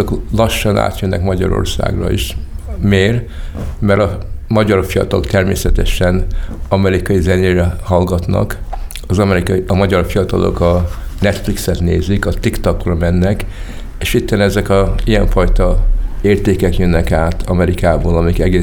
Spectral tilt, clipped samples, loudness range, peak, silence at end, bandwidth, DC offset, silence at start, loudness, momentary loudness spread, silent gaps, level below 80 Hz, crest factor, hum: -6.5 dB/octave; under 0.1%; 2 LU; 0 dBFS; 0 s; 18.5 kHz; under 0.1%; 0 s; -14 LUFS; 8 LU; none; -20 dBFS; 12 dB; none